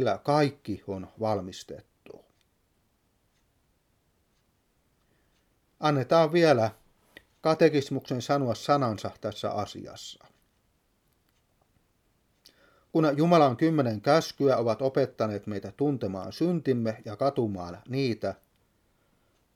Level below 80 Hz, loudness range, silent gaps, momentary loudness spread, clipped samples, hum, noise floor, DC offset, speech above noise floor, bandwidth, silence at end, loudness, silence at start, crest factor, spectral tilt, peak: -68 dBFS; 13 LU; none; 16 LU; under 0.1%; none; -71 dBFS; under 0.1%; 44 dB; 15.5 kHz; 1.2 s; -27 LUFS; 0 s; 22 dB; -6.5 dB/octave; -8 dBFS